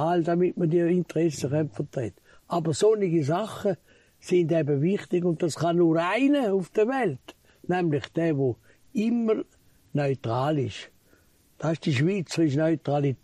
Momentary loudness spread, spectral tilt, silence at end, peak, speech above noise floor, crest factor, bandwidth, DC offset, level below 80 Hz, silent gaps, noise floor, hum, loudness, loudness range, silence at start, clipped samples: 10 LU; -7 dB/octave; 0.1 s; -12 dBFS; 36 dB; 14 dB; 12.5 kHz; under 0.1%; -64 dBFS; none; -61 dBFS; none; -26 LUFS; 4 LU; 0 s; under 0.1%